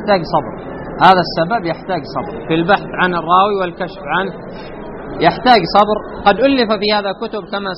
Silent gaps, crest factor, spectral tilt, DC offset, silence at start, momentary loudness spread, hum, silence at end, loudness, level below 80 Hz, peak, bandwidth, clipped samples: none; 16 dB; -3 dB/octave; under 0.1%; 0 s; 17 LU; none; 0 s; -15 LUFS; -40 dBFS; 0 dBFS; 6.2 kHz; under 0.1%